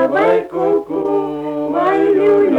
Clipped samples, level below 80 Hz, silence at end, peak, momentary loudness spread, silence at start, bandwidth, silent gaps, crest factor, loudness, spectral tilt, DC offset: under 0.1%; -54 dBFS; 0 s; -6 dBFS; 7 LU; 0 s; 5.6 kHz; none; 10 dB; -15 LUFS; -7.5 dB/octave; under 0.1%